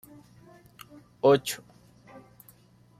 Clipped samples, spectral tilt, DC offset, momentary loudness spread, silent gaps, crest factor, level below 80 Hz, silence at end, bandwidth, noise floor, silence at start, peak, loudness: under 0.1%; -5 dB/octave; under 0.1%; 28 LU; none; 22 dB; -68 dBFS; 1.45 s; 16 kHz; -58 dBFS; 1.25 s; -10 dBFS; -25 LUFS